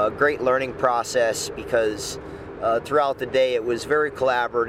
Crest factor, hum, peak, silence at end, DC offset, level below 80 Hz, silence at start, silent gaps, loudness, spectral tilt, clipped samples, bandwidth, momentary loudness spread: 16 dB; none; -6 dBFS; 0 s; under 0.1%; -50 dBFS; 0 s; none; -22 LUFS; -3.5 dB/octave; under 0.1%; 16 kHz; 7 LU